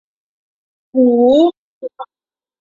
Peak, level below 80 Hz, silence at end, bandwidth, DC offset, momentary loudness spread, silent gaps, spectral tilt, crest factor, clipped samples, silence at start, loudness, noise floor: -2 dBFS; -60 dBFS; 0.55 s; 7.2 kHz; under 0.1%; 23 LU; 1.58-1.81 s; -7 dB/octave; 14 dB; under 0.1%; 0.95 s; -13 LUFS; under -90 dBFS